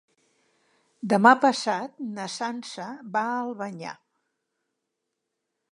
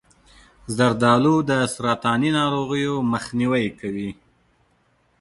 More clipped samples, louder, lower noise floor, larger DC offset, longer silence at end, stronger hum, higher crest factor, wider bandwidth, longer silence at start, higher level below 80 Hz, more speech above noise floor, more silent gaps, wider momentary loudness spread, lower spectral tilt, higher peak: neither; second, -24 LUFS vs -21 LUFS; first, -82 dBFS vs -63 dBFS; neither; first, 1.75 s vs 1.05 s; neither; first, 26 dB vs 18 dB; about the same, 11.5 kHz vs 11.5 kHz; first, 1.05 s vs 0.7 s; second, -82 dBFS vs -54 dBFS; first, 57 dB vs 43 dB; neither; first, 19 LU vs 12 LU; about the same, -4.5 dB/octave vs -5.5 dB/octave; about the same, -2 dBFS vs -4 dBFS